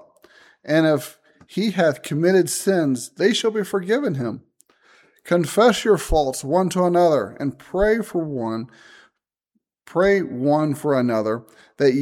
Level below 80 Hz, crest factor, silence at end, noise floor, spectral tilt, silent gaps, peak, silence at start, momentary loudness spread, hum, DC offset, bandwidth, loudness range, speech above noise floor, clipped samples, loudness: -42 dBFS; 16 dB; 0 s; -74 dBFS; -5.5 dB/octave; none; -4 dBFS; 0.65 s; 11 LU; none; under 0.1%; 17 kHz; 3 LU; 54 dB; under 0.1%; -20 LUFS